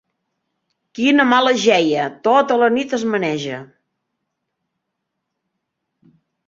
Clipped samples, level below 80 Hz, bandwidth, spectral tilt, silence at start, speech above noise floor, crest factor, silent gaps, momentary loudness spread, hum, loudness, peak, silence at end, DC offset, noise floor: under 0.1%; -66 dBFS; 7.8 kHz; -4 dB/octave; 0.95 s; 61 dB; 18 dB; none; 12 LU; none; -16 LUFS; -2 dBFS; 2.8 s; under 0.1%; -77 dBFS